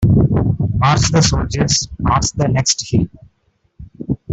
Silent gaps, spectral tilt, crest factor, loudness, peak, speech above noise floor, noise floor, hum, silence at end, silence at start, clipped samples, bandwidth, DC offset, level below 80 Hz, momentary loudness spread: none; -4.5 dB/octave; 14 dB; -15 LUFS; 0 dBFS; 47 dB; -62 dBFS; none; 0 s; 0 s; under 0.1%; 8.4 kHz; under 0.1%; -30 dBFS; 10 LU